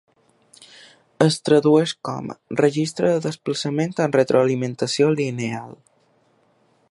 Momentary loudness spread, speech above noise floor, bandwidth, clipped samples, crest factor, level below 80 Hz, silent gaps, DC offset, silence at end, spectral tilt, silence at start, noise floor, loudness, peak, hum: 12 LU; 41 dB; 11.5 kHz; under 0.1%; 20 dB; -66 dBFS; none; under 0.1%; 1.2 s; -5.5 dB/octave; 1.2 s; -61 dBFS; -20 LUFS; -2 dBFS; none